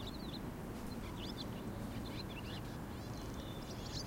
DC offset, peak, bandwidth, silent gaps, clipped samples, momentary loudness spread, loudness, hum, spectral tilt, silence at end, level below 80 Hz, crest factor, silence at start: under 0.1%; -32 dBFS; 16 kHz; none; under 0.1%; 2 LU; -46 LUFS; none; -5.5 dB/octave; 0 s; -52 dBFS; 14 dB; 0 s